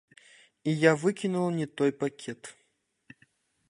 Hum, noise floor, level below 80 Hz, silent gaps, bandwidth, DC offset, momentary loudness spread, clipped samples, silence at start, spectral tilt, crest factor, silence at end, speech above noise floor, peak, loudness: none; -73 dBFS; -74 dBFS; none; 11.5 kHz; under 0.1%; 17 LU; under 0.1%; 0.65 s; -6 dB/octave; 24 dB; 1.2 s; 45 dB; -6 dBFS; -28 LUFS